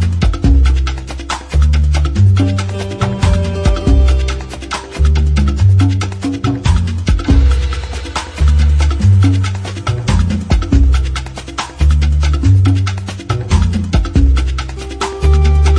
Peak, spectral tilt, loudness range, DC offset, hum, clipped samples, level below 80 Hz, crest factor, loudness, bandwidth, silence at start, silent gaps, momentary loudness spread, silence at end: 0 dBFS; -6.5 dB/octave; 1 LU; under 0.1%; none; under 0.1%; -14 dBFS; 12 dB; -14 LUFS; 10 kHz; 0 s; none; 11 LU; 0 s